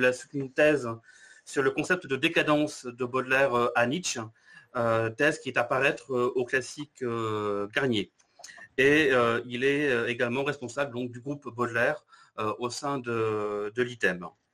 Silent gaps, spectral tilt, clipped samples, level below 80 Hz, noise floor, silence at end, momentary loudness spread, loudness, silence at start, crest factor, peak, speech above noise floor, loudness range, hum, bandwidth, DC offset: none; -4.5 dB/octave; under 0.1%; -64 dBFS; -50 dBFS; 0.25 s; 12 LU; -28 LUFS; 0 s; 18 dB; -10 dBFS; 22 dB; 4 LU; none; 14 kHz; under 0.1%